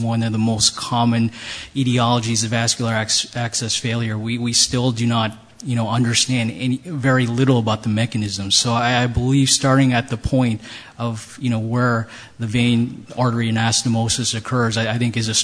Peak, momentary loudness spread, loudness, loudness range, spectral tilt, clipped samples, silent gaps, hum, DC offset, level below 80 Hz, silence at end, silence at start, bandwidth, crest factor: -2 dBFS; 8 LU; -19 LUFS; 3 LU; -4 dB/octave; under 0.1%; none; none; under 0.1%; -44 dBFS; 0 s; 0 s; 11 kHz; 18 dB